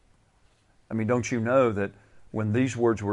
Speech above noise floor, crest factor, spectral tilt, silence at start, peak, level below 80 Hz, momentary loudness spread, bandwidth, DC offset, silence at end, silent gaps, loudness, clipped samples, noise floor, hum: 38 dB; 16 dB; -7 dB/octave; 0.9 s; -10 dBFS; -60 dBFS; 12 LU; 11 kHz; under 0.1%; 0 s; none; -26 LUFS; under 0.1%; -63 dBFS; none